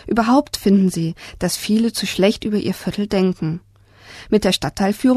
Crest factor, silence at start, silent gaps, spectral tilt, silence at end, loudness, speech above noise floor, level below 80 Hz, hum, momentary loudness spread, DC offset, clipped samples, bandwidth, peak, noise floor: 18 dB; 0.05 s; none; -5.5 dB/octave; 0 s; -19 LUFS; 26 dB; -44 dBFS; none; 9 LU; under 0.1%; under 0.1%; 13.5 kHz; -2 dBFS; -44 dBFS